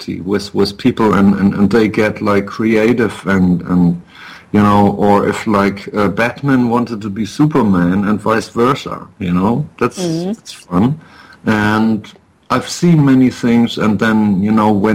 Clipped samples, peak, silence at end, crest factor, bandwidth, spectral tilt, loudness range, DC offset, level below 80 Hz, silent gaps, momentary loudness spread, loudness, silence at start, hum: under 0.1%; 0 dBFS; 0 s; 12 dB; 15 kHz; -7 dB/octave; 4 LU; under 0.1%; -44 dBFS; none; 9 LU; -14 LUFS; 0 s; none